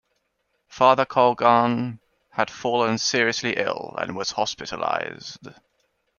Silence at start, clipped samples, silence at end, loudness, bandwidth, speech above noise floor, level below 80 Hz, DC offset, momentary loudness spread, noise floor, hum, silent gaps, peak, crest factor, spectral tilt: 0.7 s; under 0.1%; 0.65 s; -22 LUFS; 7.2 kHz; 51 dB; -64 dBFS; under 0.1%; 14 LU; -73 dBFS; none; none; -2 dBFS; 22 dB; -3.5 dB/octave